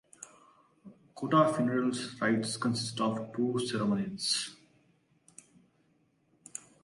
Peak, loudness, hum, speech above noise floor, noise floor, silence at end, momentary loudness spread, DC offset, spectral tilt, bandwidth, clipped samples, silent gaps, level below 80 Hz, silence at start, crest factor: -12 dBFS; -31 LUFS; none; 40 dB; -71 dBFS; 0.25 s; 19 LU; under 0.1%; -4.5 dB/octave; 11.5 kHz; under 0.1%; none; -72 dBFS; 0.2 s; 22 dB